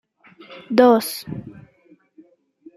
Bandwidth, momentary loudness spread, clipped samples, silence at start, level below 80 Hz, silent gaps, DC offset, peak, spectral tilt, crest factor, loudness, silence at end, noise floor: 15 kHz; 27 LU; under 0.1%; 0.5 s; -62 dBFS; none; under 0.1%; -2 dBFS; -5 dB/octave; 20 dB; -17 LUFS; 1.25 s; -55 dBFS